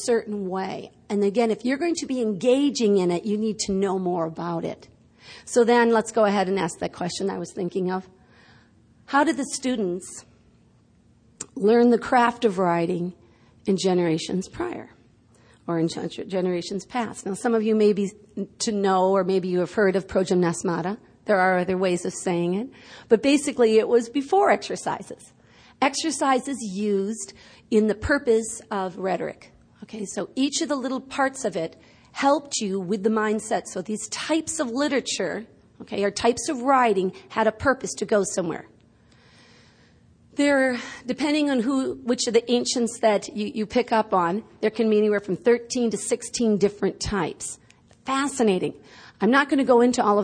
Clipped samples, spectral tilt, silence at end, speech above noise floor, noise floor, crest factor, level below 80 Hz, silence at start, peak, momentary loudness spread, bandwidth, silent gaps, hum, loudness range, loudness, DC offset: under 0.1%; -4.5 dB/octave; 0 s; 35 dB; -58 dBFS; 18 dB; -56 dBFS; 0 s; -6 dBFS; 12 LU; 10.5 kHz; none; none; 5 LU; -23 LUFS; under 0.1%